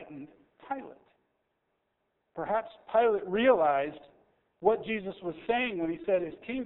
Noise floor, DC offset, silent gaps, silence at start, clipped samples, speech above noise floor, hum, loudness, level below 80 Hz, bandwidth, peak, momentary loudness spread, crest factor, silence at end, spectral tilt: -79 dBFS; under 0.1%; none; 0 s; under 0.1%; 50 dB; none; -30 LUFS; -66 dBFS; 4 kHz; -10 dBFS; 15 LU; 20 dB; 0 s; -3.5 dB/octave